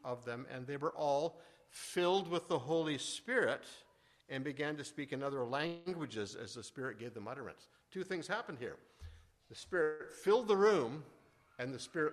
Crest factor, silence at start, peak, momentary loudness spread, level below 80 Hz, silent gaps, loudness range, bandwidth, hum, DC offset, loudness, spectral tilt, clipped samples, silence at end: 20 dB; 0.05 s; -20 dBFS; 16 LU; -72 dBFS; none; 8 LU; 13 kHz; none; under 0.1%; -38 LUFS; -4.5 dB/octave; under 0.1%; 0 s